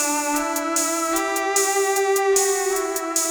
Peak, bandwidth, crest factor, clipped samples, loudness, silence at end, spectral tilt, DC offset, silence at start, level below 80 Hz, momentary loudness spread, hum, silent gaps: -4 dBFS; over 20 kHz; 18 dB; under 0.1%; -20 LUFS; 0 s; 0.5 dB/octave; under 0.1%; 0 s; -58 dBFS; 4 LU; none; none